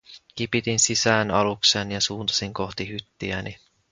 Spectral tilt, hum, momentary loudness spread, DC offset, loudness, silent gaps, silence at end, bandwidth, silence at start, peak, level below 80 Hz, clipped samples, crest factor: -2.5 dB/octave; none; 13 LU; under 0.1%; -23 LUFS; none; 0.35 s; 10 kHz; 0.1 s; -2 dBFS; -52 dBFS; under 0.1%; 22 dB